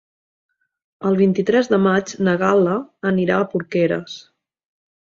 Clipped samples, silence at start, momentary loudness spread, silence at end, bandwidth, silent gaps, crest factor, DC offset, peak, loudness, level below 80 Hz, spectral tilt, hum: under 0.1%; 1 s; 9 LU; 0.85 s; 7.4 kHz; none; 16 dB; under 0.1%; -2 dBFS; -18 LUFS; -60 dBFS; -6.5 dB/octave; none